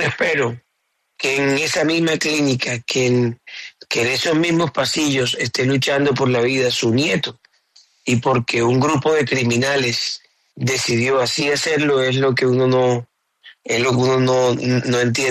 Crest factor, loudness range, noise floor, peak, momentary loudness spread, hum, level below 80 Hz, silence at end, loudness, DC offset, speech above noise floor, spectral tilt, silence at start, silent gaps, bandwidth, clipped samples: 12 dB; 1 LU; -70 dBFS; -6 dBFS; 7 LU; none; -56 dBFS; 0 s; -18 LUFS; under 0.1%; 53 dB; -4.5 dB/octave; 0 s; none; 13.5 kHz; under 0.1%